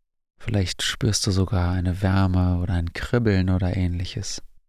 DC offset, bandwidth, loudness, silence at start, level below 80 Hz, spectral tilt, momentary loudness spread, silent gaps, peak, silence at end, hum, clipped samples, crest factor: under 0.1%; 14.5 kHz; -23 LUFS; 0.4 s; -32 dBFS; -5.5 dB/octave; 8 LU; none; -6 dBFS; 0.2 s; none; under 0.1%; 16 dB